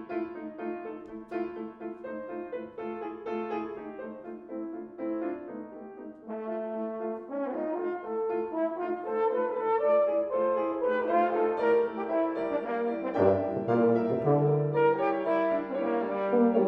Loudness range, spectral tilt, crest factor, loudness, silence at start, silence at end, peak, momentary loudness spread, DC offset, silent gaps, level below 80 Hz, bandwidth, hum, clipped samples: 11 LU; -10 dB/octave; 18 dB; -30 LUFS; 0 s; 0 s; -10 dBFS; 14 LU; under 0.1%; none; -70 dBFS; 5.2 kHz; none; under 0.1%